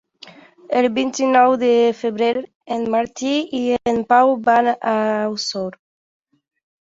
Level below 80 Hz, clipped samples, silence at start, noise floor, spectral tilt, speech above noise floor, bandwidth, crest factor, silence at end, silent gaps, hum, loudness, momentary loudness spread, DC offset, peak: -60 dBFS; under 0.1%; 0.25 s; -44 dBFS; -4 dB/octave; 27 dB; 8 kHz; 16 dB; 1.1 s; 2.55-2.61 s; none; -18 LUFS; 10 LU; under 0.1%; -2 dBFS